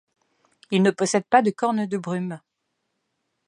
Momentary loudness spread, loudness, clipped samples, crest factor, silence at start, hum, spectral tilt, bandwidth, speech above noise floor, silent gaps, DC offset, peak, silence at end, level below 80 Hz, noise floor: 11 LU; -22 LUFS; under 0.1%; 22 dB; 0.7 s; none; -5 dB/octave; 10.5 kHz; 55 dB; none; under 0.1%; -2 dBFS; 1.1 s; -74 dBFS; -77 dBFS